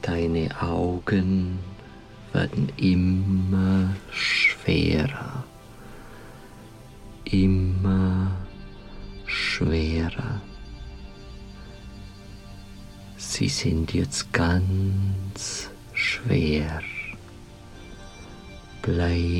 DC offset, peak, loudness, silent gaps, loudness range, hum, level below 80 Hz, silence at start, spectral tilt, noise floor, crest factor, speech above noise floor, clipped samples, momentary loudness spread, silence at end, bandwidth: under 0.1%; -4 dBFS; -25 LUFS; none; 7 LU; none; -40 dBFS; 0 s; -5.5 dB/octave; -44 dBFS; 22 dB; 21 dB; under 0.1%; 22 LU; 0 s; 12 kHz